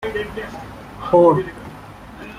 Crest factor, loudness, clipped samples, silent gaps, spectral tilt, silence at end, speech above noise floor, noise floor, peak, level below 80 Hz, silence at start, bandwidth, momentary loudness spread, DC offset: 18 dB; -17 LUFS; under 0.1%; none; -7.5 dB/octave; 0 s; 20 dB; -38 dBFS; -2 dBFS; -44 dBFS; 0 s; 14 kHz; 24 LU; under 0.1%